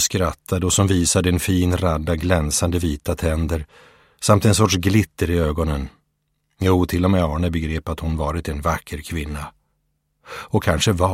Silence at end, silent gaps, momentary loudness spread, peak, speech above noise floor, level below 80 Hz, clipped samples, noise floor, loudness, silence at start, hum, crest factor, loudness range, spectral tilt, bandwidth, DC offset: 0 s; none; 11 LU; 0 dBFS; 51 dB; -32 dBFS; under 0.1%; -70 dBFS; -20 LUFS; 0 s; none; 20 dB; 5 LU; -5 dB/octave; 16.5 kHz; under 0.1%